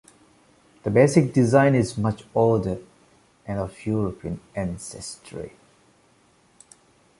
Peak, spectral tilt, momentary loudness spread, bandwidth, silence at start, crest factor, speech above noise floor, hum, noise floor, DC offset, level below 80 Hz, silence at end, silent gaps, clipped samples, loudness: -2 dBFS; -7 dB/octave; 19 LU; 11.5 kHz; 0.85 s; 22 dB; 38 dB; none; -60 dBFS; under 0.1%; -50 dBFS; 1.7 s; none; under 0.1%; -23 LUFS